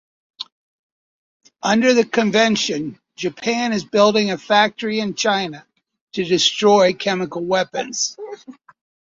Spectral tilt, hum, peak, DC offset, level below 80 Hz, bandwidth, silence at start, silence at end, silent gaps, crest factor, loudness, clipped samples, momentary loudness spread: -3.5 dB/octave; none; -2 dBFS; under 0.1%; -62 dBFS; 7.8 kHz; 0.4 s; 0.65 s; 0.52-1.40 s, 6.01-6.07 s; 18 dB; -18 LUFS; under 0.1%; 16 LU